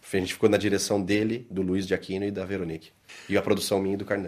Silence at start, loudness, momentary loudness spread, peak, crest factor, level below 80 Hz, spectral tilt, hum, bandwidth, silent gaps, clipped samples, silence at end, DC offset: 0.05 s; -27 LUFS; 10 LU; -8 dBFS; 20 dB; -62 dBFS; -5 dB/octave; none; 14.5 kHz; none; under 0.1%; 0 s; under 0.1%